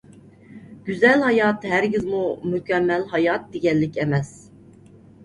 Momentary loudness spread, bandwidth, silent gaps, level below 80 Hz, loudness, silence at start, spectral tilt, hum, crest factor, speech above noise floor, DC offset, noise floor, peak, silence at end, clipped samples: 9 LU; 11 kHz; none; -56 dBFS; -21 LUFS; 0.5 s; -7 dB/octave; none; 18 dB; 27 dB; under 0.1%; -48 dBFS; -4 dBFS; 0.95 s; under 0.1%